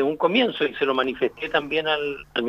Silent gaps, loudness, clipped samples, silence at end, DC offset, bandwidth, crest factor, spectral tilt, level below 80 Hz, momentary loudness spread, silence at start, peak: none; -23 LUFS; under 0.1%; 0 s; under 0.1%; 7.2 kHz; 18 dB; -6 dB/octave; -58 dBFS; 5 LU; 0 s; -6 dBFS